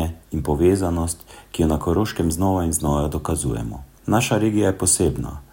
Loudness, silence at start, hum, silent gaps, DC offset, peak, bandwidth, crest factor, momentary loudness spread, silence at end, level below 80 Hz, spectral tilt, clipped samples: -21 LUFS; 0 s; none; none; under 0.1%; -4 dBFS; 16.5 kHz; 16 dB; 11 LU; 0.1 s; -34 dBFS; -5 dB/octave; under 0.1%